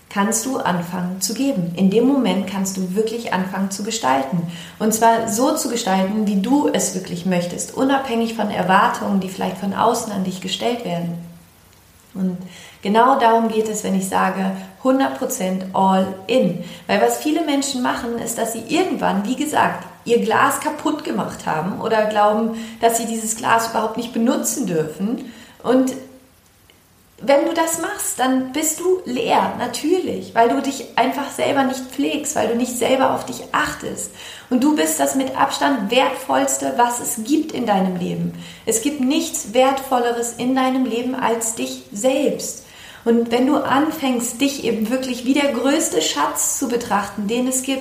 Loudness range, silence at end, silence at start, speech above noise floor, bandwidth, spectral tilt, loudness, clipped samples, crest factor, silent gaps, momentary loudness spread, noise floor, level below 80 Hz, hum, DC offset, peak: 2 LU; 0 s; 0.1 s; 33 dB; 15.5 kHz; -4 dB/octave; -19 LUFS; under 0.1%; 18 dB; none; 8 LU; -52 dBFS; -58 dBFS; none; under 0.1%; -2 dBFS